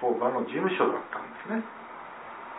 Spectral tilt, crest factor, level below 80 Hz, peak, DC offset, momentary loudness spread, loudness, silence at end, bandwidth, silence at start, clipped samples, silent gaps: -9.5 dB/octave; 20 dB; -76 dBFS; -10 dBFS; under 0.1%; 16 LU; -29 LUFS; 0 s; 4 kHz; 0 s; under 0.1%; none